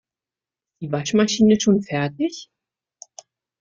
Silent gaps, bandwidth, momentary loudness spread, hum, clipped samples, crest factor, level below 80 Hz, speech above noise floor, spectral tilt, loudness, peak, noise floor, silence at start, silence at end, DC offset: none; 7.6 kHz; 14 LU; none; under 0.1%; 18 dB; -58 dBFS; 71 dB; -5 dB/octave; -20 LUFS; -6 dBFS; -90 dBFS; 0.8 s; 1.15 s; under 0.1%